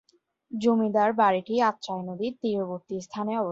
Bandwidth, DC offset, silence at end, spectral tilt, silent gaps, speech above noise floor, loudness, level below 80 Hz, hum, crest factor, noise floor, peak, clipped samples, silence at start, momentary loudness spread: 7.8 kHz; under 0.1%; 0 s; -6 dB/octave; none; 23 dB; -26 LUFS; -72 dBFS; none; 18 dB; -48 dBFS; -10 dBFS; under 0.1%; 0.5 s; 12 LU